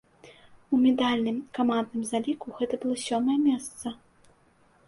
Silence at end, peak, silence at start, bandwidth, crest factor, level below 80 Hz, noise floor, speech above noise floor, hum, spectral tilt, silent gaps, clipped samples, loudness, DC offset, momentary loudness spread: 0.9 s; -12 dBFS; 0.25 s; 11.5 kHz; 16 dB; -66 dBFS; -62 dBFS; 36 dB; none; -4.5 dB/octave; none; under 0.1%; -27 LUFS; under 0.1%; 12 LU